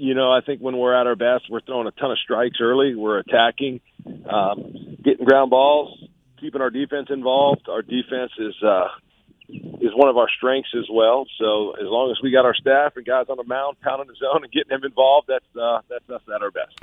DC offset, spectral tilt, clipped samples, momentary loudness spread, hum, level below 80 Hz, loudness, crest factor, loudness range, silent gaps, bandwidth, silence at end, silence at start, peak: under 0.1%; -7 dB/octave; under 0.1%; 12 LU; none; -64 dBFS; -20 LUFS; 20 dB; 3 LU; none; 4.3 kHz; 0.2 s; 0 s; 0 dBFS